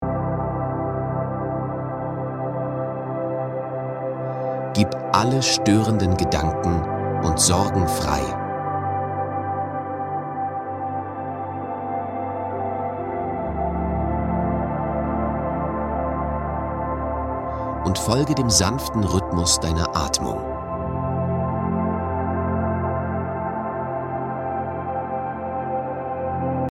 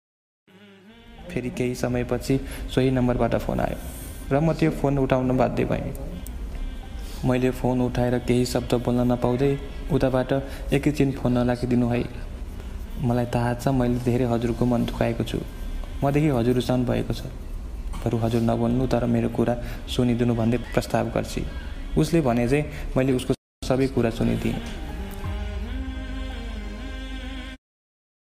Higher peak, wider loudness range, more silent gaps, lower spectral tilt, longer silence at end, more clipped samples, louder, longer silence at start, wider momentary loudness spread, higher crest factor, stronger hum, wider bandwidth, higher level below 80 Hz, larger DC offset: first, 0 dBFS vs -4 dBFS; first, 6 LU vs 3 LU; second, none vs 23.38-23.62 s; second, -5 dB/octave vs -7 dB/octave; second, 0 s vs 0.65 s; neither; about the same, -24 LUFS vs -24 LUFS; second, 0 s vs 0.6 s; second, 9 LU vs 14 LU; about the same, 22 dB vs 20 dB; neither; about the same, 16 kHz vs 16 kHz; about the same, -38 dBFS vs -34 dBFS; neither